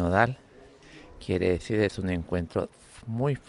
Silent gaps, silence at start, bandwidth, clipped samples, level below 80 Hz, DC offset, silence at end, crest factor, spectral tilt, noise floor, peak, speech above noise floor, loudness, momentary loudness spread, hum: none; 0 s; 11 kHz; under 0.1%; -52 dBFS; under 0.1%; 0.1 s; 22 dB; -7 dB/octave; -52 dBFS; -6 dBFS; 25 dB; -28 LUFS; 17 LU; none